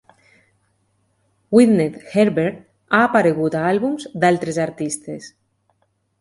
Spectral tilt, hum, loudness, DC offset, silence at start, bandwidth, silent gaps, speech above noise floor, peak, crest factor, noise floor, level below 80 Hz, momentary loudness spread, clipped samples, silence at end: -6 dB/octave; none; -18 LUFS; under 0.1%; 1.5 s; 11.5 kHz; none; 49 dB; 0 dBFS; 20 dB; -67 dBFS; -60 dBFS; 11 LU; under 0.1%; 0.95 s